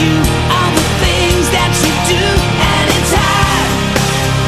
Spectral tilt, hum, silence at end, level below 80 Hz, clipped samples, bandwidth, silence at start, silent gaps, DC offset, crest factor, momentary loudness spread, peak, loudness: -4 dB/octave; none; 0 s; -22 dBFS; under 0.1%; 14 kHz; 0 s; none; under 0.1%; 12 dB; 2 LU; 0 dBFS; -11 LUFS